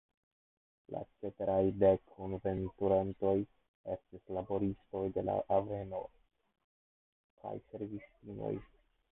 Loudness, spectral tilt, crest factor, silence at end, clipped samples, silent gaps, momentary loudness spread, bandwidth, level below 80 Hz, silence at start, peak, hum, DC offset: -36 LUFS; -6.5 dB/octave; 22 dB; 0.5 s; under 0.1%; 3.68-3.84 s, 6.64-7.37 s; 15 LU; 3.9 kHz; -60 dBFS; 0.9 s; -14 dBFS; none; under 0.1%